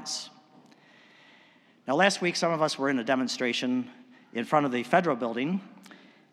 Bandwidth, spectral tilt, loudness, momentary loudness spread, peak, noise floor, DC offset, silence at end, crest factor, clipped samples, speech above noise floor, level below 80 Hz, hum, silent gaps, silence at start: 13.5 kHz; -4 dB/octave; -27 LUFS; 12 LU; -8 dBFS; -59 dBFS; under 0.1%; 0.55 s; 22 dB; under 0.1%; 33 dB; under -90 dBFS; none; none; 0 s